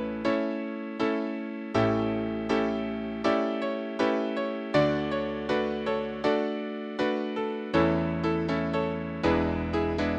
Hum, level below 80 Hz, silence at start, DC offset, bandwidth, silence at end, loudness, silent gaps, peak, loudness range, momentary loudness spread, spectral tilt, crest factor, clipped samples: none; -48 dBFS; 0 s; under 0.1%; 8.6 kHz; 0 s; -28 LUFS; none; -10 dBFS; 1 LU; 6 LU; -7 dB/octave; 18 dB; under 0.1%